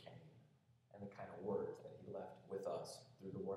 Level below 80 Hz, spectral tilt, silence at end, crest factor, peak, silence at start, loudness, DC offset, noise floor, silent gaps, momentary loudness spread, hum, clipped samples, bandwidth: -86 dBFS; -6 dB/octave; 0 s; 18 dB; -32 dBFS; 0 s; -50 LUFS; under 0.1%; -73 dBFS; none; 16 LU; none; under 0.1%; 13 kHz